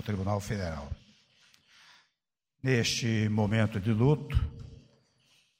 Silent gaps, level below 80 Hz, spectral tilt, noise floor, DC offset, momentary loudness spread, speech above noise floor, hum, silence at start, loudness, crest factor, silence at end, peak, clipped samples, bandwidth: none; -44 dBFS; -5.5 dB/octave; -86 dBFS; under 0.1%; 17 LU; 58 dB; none; 0 s; -30 LUFS; 20 dB; 0.85 s; -12 dBFS; under 0.1%; 15.5 kHz